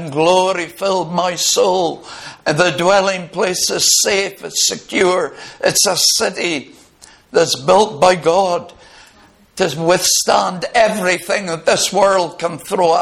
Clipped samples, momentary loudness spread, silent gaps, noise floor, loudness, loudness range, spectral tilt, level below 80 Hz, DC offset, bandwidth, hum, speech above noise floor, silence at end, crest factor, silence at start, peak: under 0.1%; 8 LU; none; -48 dBFS; -15 LUFS; 2 LU; -2 dB/octave; -54 dBFS; under 0.1%; 16 kHz; none; 32 dB; 0 s; 16 dB; 0 s; 0 dBFS